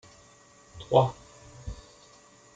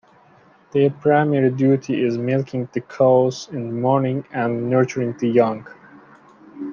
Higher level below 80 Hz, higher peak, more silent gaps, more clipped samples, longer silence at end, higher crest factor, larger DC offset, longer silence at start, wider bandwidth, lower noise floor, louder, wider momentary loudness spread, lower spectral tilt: first, -52 dBFS vs -66 dBFS; about the same, -6 dBFS vs -4 dBFS; neither; neither; first, 0.8 s vs 0 s; first, 26 dB vs 16 dB; neither; about the same, 0.75 s vs 0.75 s; first, 9.2 kHz vs 7.2 kHz; first, -56 dBFS vs -52 dBFS; second, -25 LUFS vs -20 LUFS; first, 25 LU vs 10 LU; about the same, -6.5 dB/octave vs -7.5 dB/octave